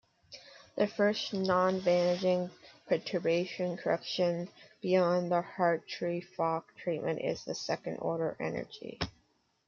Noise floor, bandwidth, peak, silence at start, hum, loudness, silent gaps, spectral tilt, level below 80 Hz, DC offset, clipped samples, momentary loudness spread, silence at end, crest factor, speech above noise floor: -73 dBFS; 7.2 kHz; -14 dBFS; 0.3 s; none; -32 LUFS; none; -5.5 dB/octave; -68 dBFS; under 0.1%; under 0.1%; 12 LU; 0.6 s; 18 dB; 41 dB